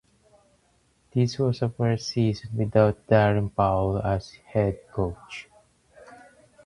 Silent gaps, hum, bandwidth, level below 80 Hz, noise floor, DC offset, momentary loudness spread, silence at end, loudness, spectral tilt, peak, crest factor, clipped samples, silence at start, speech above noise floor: none; none; 11 kHz; -46 dBFS; -65 dBFS; under 0.1%; 10 LU; 0.5 s; -25 LUFS; -7.5 dB/octave; -4 dBFS; 20 dB; under 0.1%; 1.15 s; 41 dB